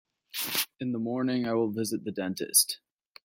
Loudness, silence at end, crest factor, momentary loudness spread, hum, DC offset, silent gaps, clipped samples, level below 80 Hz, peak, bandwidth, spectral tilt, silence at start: -28 LUFS; 0.5 s; 24 dB; 11 LU; none; under 0.1%; none; under 0.1%; -74 dBFS; -8 dBFS; 16.5 kHz; -3 dB/octave; 0.35 s